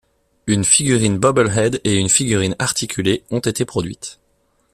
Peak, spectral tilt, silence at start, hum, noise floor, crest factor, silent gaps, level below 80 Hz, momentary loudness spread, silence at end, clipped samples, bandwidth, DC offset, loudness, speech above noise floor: 0 dBFS; -4 dB/octave; 0.45 s; none; -62 dBFS; 18 dB; none; -46 dBFS; 12 LU; 0.6 s; under 0.1%; 14.5 kHz; under 0.1%; -17 LUFS; 45 dB